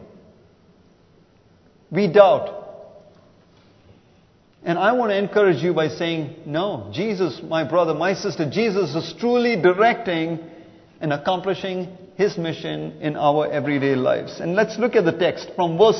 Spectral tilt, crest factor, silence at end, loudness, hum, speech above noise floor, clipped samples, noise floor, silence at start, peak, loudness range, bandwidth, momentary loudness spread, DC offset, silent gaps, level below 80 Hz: -6.5 dB/octave; 22 dB; 0 s; -21 LUFS; none; 35 dB; under 0.1%; -55 dBFS; 0 s; 0 dBFS; 3 LU; 6.4 kHz; 11 LU; under 0.1%; none; -62 dBFS